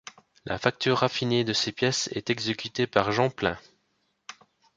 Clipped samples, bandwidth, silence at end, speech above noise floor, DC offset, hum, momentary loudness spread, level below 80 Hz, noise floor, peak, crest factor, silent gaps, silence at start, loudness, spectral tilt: under 0.1%; 9.4 kHz; 0.45 s; 47 dB; under 0.1%; none; 22 LU; -58 dBFS; -73 dBFS; -4 dBFS; 24 dB; none; 0.45 s; -26 LUFS; -4 dB/octave